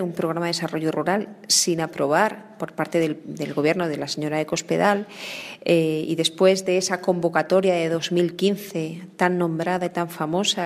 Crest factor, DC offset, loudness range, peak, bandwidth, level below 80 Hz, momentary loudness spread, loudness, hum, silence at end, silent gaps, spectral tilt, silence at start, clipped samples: 20 dB; under 0.1%; 3 LU; -4 dBFS; 15.5 kHz; -68 dBFS; 10 LU; -23 LUFS; none; 0 s; none; -4 dB/octave; 0 s; under 0.1%